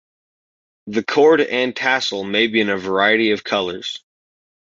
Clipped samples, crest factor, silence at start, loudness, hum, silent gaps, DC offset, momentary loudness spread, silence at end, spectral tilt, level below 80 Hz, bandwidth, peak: under 0.1%; 16 dB; 0.85 s; -17 LUFS; none; none; under 0.1%; 11 LU; 0.7 s; -4 dB/octave; -62 dBFS; 7.6 kHz; -2 dBFS